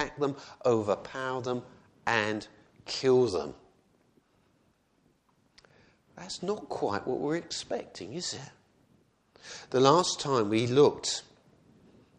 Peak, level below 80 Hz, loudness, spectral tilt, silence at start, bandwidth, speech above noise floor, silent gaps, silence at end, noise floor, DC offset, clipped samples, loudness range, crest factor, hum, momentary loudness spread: -6 dBFS; -66 dBFS; -29 LUFS; -4.5 dB/octave; 0 s; 10 kHz; 40 dB; none; 1 s; -69 dBFS; under 0.1%; under 0.1%; 11 LU; 26 dB; none; 17 LU